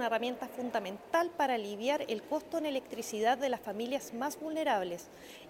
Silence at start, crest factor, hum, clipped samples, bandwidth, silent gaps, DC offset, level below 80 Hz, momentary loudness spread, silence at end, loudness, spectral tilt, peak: 0 s; 16 dB; none; under 0.1%; 16.5 kHz; none; under 0.1%; -74 dBFS; 7 LU; 0 s; -34 LUFS; -3.5 dB/octave; -18 dBFS